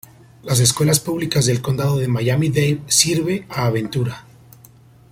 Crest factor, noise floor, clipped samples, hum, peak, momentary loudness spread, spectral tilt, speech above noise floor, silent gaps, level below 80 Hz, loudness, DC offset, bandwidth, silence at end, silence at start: 20 dB; -47 dBFS; under 0.1%; none; 0 dBFS; 9 LU; -4 dB/octave; 29 dB; none; -48 dBFS; -18 LUFS; under 0.1%; 16.5 kHz; 0.9 s; 0.45 s